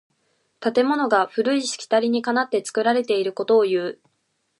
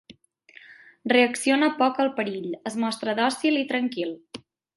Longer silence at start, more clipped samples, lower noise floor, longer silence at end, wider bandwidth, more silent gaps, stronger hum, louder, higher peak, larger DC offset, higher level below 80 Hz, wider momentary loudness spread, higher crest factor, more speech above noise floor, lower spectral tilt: first, 0.6 s vs 0.1 s; neither; first, -71 dBFS vs -54 dBFS; first, 0.65 s vs 0.4 s; about the same, 11.5 kHz vs 11.5 kHz; neither; neither; first, -21 LUFS vs -24 LUFS; about the same, -4 dBFS vs -4 dBFS; neither; about the same, -78 dBFS vs -74 dBFS; second, 5 LU vs 14 LU; about the same, 18 dB vs 20 dB; first, 51 dB vs 30 dB; about the same, -3.5 dB/octave vs -3.5 dB/octave